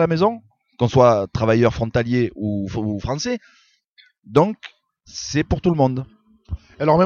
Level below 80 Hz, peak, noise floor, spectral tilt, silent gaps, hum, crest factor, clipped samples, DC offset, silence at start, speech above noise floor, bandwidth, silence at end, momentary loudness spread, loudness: -40 dBFS; 0 dBFS; -56 dBFS; -6.5 dB/octave; 3.85-3.96 s; none; 20 dB; under 0.1%; under 0.1%; 0 s; 37 dB; 7.4 kHz; 0 s; 19 LU; -20 LUFS